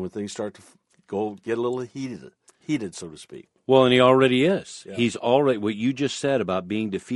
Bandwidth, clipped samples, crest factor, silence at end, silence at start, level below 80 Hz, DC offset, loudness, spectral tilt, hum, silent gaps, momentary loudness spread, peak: 11.5 kHz; under 0.1%; 20 dB; 0 s; 0 s; -64 dBFS; under 0.1%; -23 LUFS; -5.5 dB/octave; none; none; 20 LU; -2 dBFS